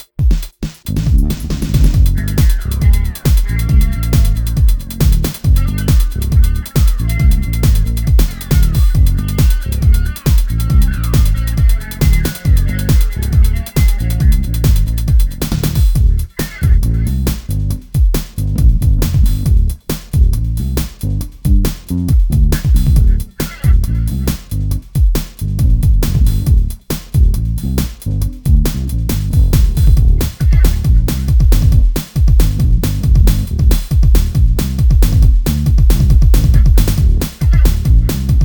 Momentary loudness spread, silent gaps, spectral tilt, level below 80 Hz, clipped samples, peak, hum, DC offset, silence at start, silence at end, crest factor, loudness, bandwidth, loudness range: 7 LU; none; -6.5 dB/octave; -12 dBFS; under 0.1%; 0 dBFS; none; under 0.1%; 0.2 s; 0 s; 10 dB; -14 LUFS; over 20 kHz; 3 LU